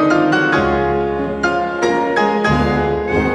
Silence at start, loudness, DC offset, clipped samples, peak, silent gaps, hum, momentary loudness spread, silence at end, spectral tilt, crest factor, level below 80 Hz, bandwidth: 0 s; -16 LUFS; under 0.1%; under 0.1%; -2 dBFS; none; none; 4 LU; 0 s; -6 dB/octave; 14 dB; -32 dBFS; 10.5 kHz